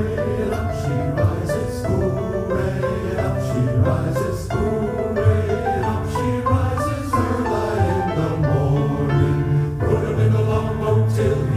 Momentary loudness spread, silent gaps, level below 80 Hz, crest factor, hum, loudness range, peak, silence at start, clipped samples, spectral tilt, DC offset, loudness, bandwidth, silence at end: 4 LU; none; -34 dBFS; 16 dB; none; 2 LU; -4 dBFS; 0 s; under 0.1%; -8 dB/octave; under 0.1%; -20 LUFS; 15 kHz; 0 s